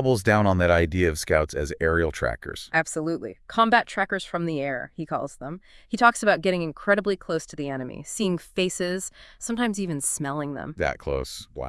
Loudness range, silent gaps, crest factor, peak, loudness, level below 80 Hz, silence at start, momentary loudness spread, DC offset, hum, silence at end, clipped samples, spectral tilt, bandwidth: 4 LU; none; 22 dB; -2 dBFS; -25 LUFS; -46 dBFS; 0 s; 13 LU; under 0.1%; none; 0 s; under 0.1%; -4.5 dB/octave; 12 kHz